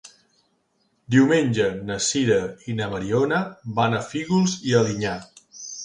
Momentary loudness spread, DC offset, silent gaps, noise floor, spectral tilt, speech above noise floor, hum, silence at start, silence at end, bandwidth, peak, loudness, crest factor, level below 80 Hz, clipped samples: 10 LU; under 0.1%; none; -68 dBFS; -5 dB/octave; 47 dB; none; 0.05 s; 0 s; 11 kHz; -4 dBFS; -22 LUFS; 18 dB; -56 dBFS; under 0.1%